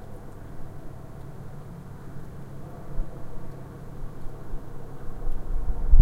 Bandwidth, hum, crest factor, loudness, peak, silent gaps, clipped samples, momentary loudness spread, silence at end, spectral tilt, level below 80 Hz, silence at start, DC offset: 2.3 kHz; none; 22 dB; -39 LUFS; -2 dBFS; none; under 0.1%; 8 LU; 0 s; -8.5 dB/octave; -28 dBFS; 0 s; under 0.1%